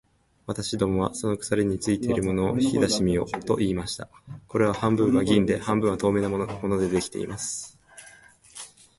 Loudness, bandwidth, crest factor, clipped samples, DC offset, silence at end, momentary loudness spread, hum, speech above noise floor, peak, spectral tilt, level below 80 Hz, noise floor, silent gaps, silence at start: -25 LUFS; 11.5 kHz; 18 dB; under 0.1%; under 0.1%; 0.3 s; 14 LU; none; 27 dB; -8 dBFS; -5.5 dB/octave; -48 dBFS; -52 dBFS; none; 0.5 s